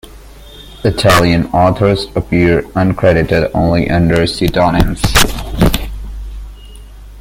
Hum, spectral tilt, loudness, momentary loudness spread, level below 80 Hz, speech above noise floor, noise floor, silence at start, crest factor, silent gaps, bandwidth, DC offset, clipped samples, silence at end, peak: none; -5.5 dB/octave; -12 LUFS; 12 LU; -24 dBFS; 24 dB; -35 dBFS; 0.05 s; 12 dB; none; 17 kHz; under 0.1%; under 0.1%; 0 s; 0 dBFS